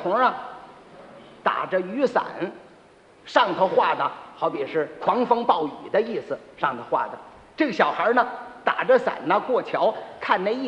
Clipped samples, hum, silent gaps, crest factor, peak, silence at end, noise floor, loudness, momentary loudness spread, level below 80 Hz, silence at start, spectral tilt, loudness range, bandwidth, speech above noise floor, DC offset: under 0.1%; none; none; 20 dB; -4 dBFS; 0 s; -52 dBFS; -23 LUFS; 12 LU; -68 dBFS; 0 s; -5.5 dB/octave; 2 LU; 9.2 kHz; 29 dB; under 0.1%